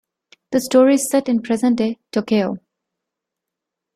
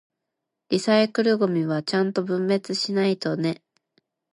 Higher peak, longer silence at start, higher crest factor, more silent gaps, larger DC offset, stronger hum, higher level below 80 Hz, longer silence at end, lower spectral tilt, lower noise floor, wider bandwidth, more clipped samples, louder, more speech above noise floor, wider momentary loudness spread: first, -2 dBFS vs -6 dBFS; second, 0.5 s vs 0.7 s; about the same, 16 dB vs 18 dB; neither; neither; neither; first, -62 dBFS vs -72 dBFS; first, 1.35 s vs 0.8 s; about the same, -5 dB/octave vs -5.5 dB/octave; about the same, -83 dBFS vs -83 dBFS; first, 15.5 kHz vs 11.5 kHz; neither; first, -18 LUFS vs -23 LUFS; first, 66 dB vs 60 dB; first, 10 LU vs 7 LU